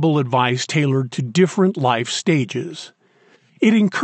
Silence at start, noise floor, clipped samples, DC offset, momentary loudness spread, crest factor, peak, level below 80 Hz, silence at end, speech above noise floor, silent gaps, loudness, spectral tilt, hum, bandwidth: 0 s; -55 dBFS; under 0.1%; under 0.1%; 11 LU; 14 dB; -4 dBFS; -74 dBFS; 0 s; 37 dB; none; -18 LUFS; -5.5 dB/octave; none; 9.2 kHz